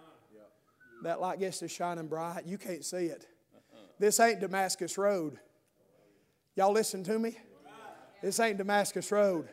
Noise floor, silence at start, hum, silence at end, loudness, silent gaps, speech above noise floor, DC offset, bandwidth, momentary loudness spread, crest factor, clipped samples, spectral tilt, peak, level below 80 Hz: -69 dBFS; 0.4 s; none; 0 s; -32 LUFS; none; 38 dB; under 0.1%; 16 kHz; 14 LU; 20 dB; under 0.1%; -3.5 dB/octave; -12 dBFS; -86 dBFS